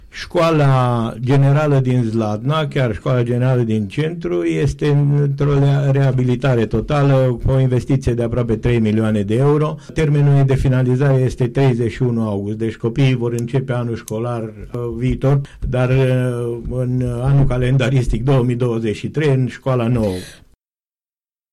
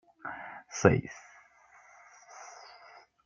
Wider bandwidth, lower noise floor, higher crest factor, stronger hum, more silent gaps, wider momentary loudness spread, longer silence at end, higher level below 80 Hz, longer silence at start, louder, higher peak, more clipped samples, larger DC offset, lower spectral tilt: first, 11.5 kHz vs 7.6 kHz; first, under -90 dBFS vs -60 dBFS; second, 8 dB vs 30 dB; neither; neither; second, 7 LU vs 26 LU; first, 1.2 s vs 0.75 s; first, -34 dBFS vs -62 dBFS; about the same, 0.15 s vs 0.25 s; first, -17 LUFS vs -30 LUFS; about the same, -8 dBFS vs -6 dBFS; neither; neither; first, -8 dB/octave vs -6 dB/octave